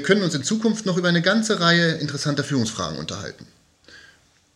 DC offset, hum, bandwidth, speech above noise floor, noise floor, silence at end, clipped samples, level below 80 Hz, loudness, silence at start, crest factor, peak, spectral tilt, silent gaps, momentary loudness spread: under 0.1%; none; 11.5 kHz; 34 dB; -56 dBFS; 0.55 s; under 0.1%; -58 dBFS; -21 LUFS; 0 s; 22 dB; -2 dBFS; -4.5 dB/octave; none; 12 LU